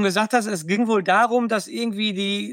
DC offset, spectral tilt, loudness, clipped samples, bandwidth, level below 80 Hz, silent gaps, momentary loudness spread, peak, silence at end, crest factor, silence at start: under 0.1%; -4 dB/octave; -21 LUFS; under 0.1%; 16.5 kHz; -74 dBFS; none; 6 LU; -6 dBFS; 0 s; 16 dB; 0 s